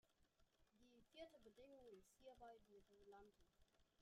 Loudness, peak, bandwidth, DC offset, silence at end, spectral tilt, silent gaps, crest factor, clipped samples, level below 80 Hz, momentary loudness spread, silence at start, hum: -67 LUFS; -46 dBFS; 11.5 kHz; under 0.1%; 0 s; -4 dB/octave; none; 22 dB; under 0.1%; -84 dBFS; 5 LU; 0.05 s; none